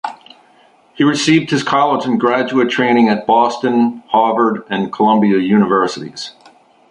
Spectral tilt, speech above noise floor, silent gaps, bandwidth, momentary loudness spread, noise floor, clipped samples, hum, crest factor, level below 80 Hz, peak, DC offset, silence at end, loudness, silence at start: -5.5 dB/octave; 36 dB; none; 11 kHz; 8 LU; -50 dBFS; under 0.1%; none; 14 dB; -58 dBFS; -2 dBFS; under 0.1%; 0.6 s; -14 LUFS; 0.05 s